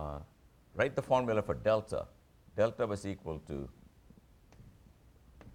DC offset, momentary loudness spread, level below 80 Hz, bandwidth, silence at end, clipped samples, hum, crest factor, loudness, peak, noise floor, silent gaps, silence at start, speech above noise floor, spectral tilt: under 0.1%; 17 LU; -56 dBFS; 13.5 kHz; 0 s; under 0.1%; none; 20 dB; -34 LUFS; -16 dBFS; -62 dBFS; none; 0 s; 29 dB; -6.5 dB/octave